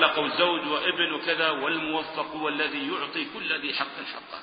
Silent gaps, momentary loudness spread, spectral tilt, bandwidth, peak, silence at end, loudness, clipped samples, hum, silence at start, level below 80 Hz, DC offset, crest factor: none; 7 LU; -7.5 dB/octave; 5.2 kHz; -6 dBFS; 0 s; -27 LUFS; under 0.1%; none; 0 s; -70 dBFS; under 0.1%; 22 dB